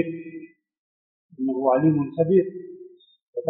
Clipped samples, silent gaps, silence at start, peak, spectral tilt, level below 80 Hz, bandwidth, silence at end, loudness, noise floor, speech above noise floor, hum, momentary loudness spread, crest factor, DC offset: under 0.1%; 0.78-1.29 s, 3.23-3.33 s; 0 s; -8 dBFS; -7 dB/octave; -68 dBFS; 3.9 kHz; 0 s; -22 LUFS; -47 dBFS; 26 dB; none; 20 LU; 18 dB; under 0.1%